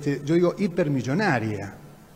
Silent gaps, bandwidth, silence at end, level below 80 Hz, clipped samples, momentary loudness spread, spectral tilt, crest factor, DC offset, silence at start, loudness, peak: none; 15.5 kHz; 0.2 s; -58 dBFS; under 0.1%; 10 LU; -7 dB/octave; 16 dB; under 0.1%; 0 s; -24 LUFS; -8 dBFS